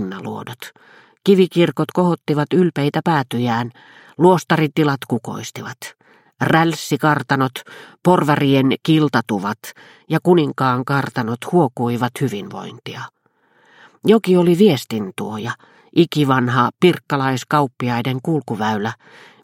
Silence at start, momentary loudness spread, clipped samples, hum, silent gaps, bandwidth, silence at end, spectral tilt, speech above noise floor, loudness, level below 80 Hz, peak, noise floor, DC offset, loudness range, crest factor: 0 s; 16 LU; under 0.1%; none; none; 16.5 kHz; 0.5 s; -6.5 dB/octave; 41 dB; -18 LUFS; -62 dBFS; 0 dBFS; -58 dBFS; under 0.1%; 3 LU; 18 dB